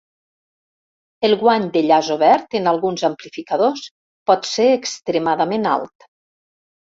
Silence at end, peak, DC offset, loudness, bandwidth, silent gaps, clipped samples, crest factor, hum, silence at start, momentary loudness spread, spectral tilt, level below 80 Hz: 1.05 s; -2 dBFS; under 0.1%; -18 LUFS; 7.8 kHz; 3.91-4.26 s; under 0.1%; 18 dB; none; 1.2 s; 10 LU; -4.5 dB/octave; -64 dBFS